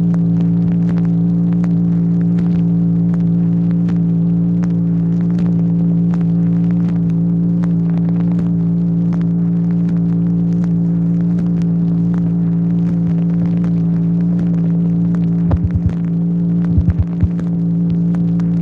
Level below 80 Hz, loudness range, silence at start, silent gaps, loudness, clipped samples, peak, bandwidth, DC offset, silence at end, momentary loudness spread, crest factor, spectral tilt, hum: -34 dBFS; 1 LU; 0 s; none; -15 LUFS; under 0.1%; -2 dBFS; 2.4 kHz; under 0.1%; 0 s; 1 LU; 12 dB; -11.5 dB/octave; none